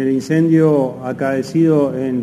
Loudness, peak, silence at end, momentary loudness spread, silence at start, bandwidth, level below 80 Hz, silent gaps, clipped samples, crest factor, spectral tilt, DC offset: -15 LUFS; -2 dBFS; 0 s; 7 LU; 0 s; 11.5 kHz; -60 dBFS; none; under 0.1%; 12 dB; -8 dB/octave; under 0.1%